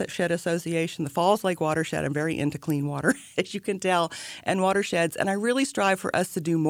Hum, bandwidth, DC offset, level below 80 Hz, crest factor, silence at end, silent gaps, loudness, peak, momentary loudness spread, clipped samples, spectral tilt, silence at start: none; 19 kHz; under 0.1%; -62 dBFS; 18 dB; 0 s; none; -26 LUFS; -8 dBFS; 5 LU; under 0.1%; -5 dB/octave; 0 s